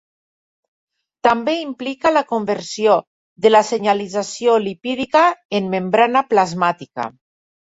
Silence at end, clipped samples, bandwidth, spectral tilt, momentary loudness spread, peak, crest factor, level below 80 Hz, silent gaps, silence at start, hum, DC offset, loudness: 0.55 s; under 0.1%; 8 kHz; -4.5 dB/octave; 9 LU; -2 dBFS; 16 dB; -62 dBFS; 3.07-3.36 s, 5.45-5.49 s; 1.25 s; none; under 0.1%; -17 LUFS